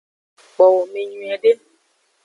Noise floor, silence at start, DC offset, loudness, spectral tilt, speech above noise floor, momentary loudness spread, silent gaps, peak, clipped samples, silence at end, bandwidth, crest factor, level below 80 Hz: -63 dBFS; 0.6 s; under 0.1%; -18 LUFS; -4.5 dB/octave; 47 dB; 12 LU; none; -2 dBFS; under 0.1%; 0.7 s; 10 kHz; 18 dB; -80 dBFS